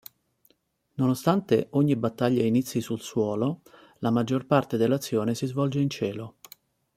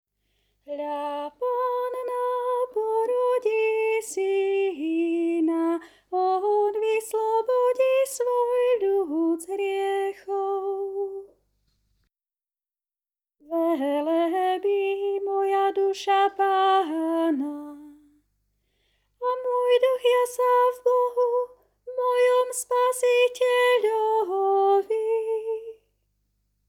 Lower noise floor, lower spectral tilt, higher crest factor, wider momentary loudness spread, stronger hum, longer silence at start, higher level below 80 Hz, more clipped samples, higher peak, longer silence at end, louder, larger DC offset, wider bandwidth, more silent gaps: second, -69 dBFS vs under -90 dBFS; first, -7 dB/octave vs -1.5 dB/octave; first, 20 dB vs 14 dB; about the same, 8 LU vs 9 LU; second, none vs 50 Hz at -75 dBFS; first, 1 s vs 0.7 s; first, -66 dBFS vs -74 dBFS; neither; first, -6 dBFS vs -10 dBFS; second, 0.65 s vs 0.95 s; about the same, -26 LUFS vs -24 LUFS; neither; about the same, 16 kHz vs 16 kHz; neither